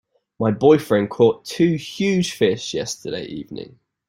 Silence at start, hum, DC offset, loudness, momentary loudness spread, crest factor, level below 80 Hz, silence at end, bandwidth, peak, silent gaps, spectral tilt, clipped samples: 0.4 s; none; under 0.1%; -20 LUFS; 15 LU; 18 dB; -58 dBFS; 0.4 s; 16 kHz; -2 dBFS; none; -5.5 dB/octave; under 0.1%